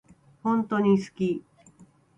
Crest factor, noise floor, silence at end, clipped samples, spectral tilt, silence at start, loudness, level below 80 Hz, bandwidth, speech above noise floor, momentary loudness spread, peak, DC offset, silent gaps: 16 dB; -56 dBFS; 0.8 s; under 0.1%; -8 dB/octave; 0.45 s; -26 LUFS; -66 dBFS; 8.8 kHz; 32 dB; 9 LU; -10 dBFS; under 0.1%; none